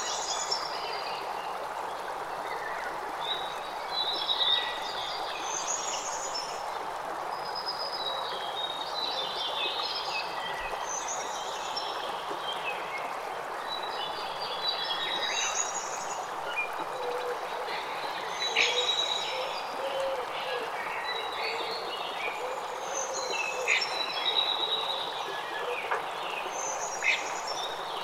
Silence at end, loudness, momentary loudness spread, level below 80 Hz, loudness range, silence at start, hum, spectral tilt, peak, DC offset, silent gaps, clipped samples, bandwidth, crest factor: 0 s; -31 LUFS; 8 LU; -66 dBFS; 4 LU; 0 s; none; 0 dB/octave; -12 dBFS; under 0.1%; none; under 0.1%; 16 kHz; 22 dB